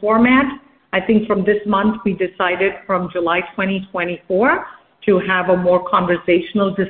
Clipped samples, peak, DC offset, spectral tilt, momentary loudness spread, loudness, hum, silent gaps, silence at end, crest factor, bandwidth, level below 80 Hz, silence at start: under 0.1%; -2 dBFS; under 0.1%; -11 dB/octave; 7 LU; -17 LUFS; none; none; 0 s; 16 dB; 4.3 kHz; -50 dBFS; 0 s